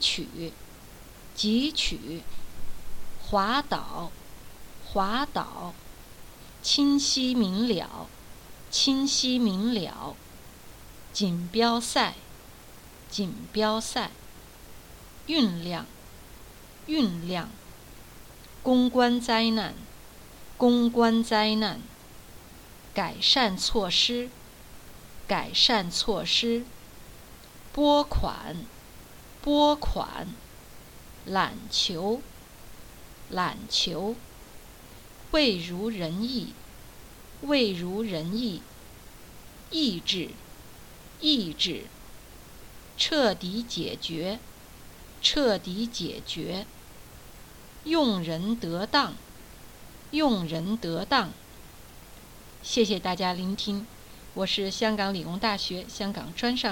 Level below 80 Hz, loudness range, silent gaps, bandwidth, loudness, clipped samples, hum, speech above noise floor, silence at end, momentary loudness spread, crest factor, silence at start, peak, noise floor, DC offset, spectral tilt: -46 dBFS; 6 LU; none; 18.5 kHz; -27 LUFS; under 0.1%; none; 21 dB; 0 s; 25 LU; 22 dB; 0 s; -6 dBFS; -48 dBFS; under 0.1%; -3.5 dB/octave